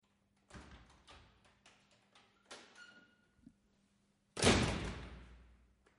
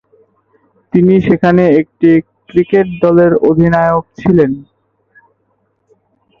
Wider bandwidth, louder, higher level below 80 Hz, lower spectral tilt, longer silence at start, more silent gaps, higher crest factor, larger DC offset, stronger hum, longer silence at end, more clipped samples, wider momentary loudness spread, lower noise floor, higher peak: first, 11.5 kHz vs 6.2 kHz; second, -35 LUFS vs -11 LUFS; second, -54 dBFS vs -42 dBFS; second, -4 dB/octave vs -10 dB/octave; second, 0.55 s vs 0.95 s; neither; first, 28 dB vs 12 dB; neither; neither; second, 0.6 s vs 1.8 s; neither; first, 30 LU vs 7 LU; first, -76 dBFS vs -61 dBFS; second, -16 dBFS vs 0 dBFS